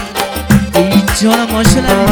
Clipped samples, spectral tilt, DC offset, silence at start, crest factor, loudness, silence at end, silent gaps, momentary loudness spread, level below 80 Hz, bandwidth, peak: 1%; -5 dB/octave; under 0.1%; 0 s; 10 dB; -11 LUFS; 0 s; none; 4 LU; -24 dBFS; over 20 kHz; 0 dBFS